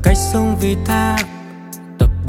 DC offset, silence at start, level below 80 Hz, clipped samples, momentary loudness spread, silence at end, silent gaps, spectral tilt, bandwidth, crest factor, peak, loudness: under 0.1%; 0 s; -22 dBFS; under 0.1%; 17 LU; 0 s; none; -5.5 dB/octave; 17 kHz; 16 dB; 0 dBFS; -17 LUFS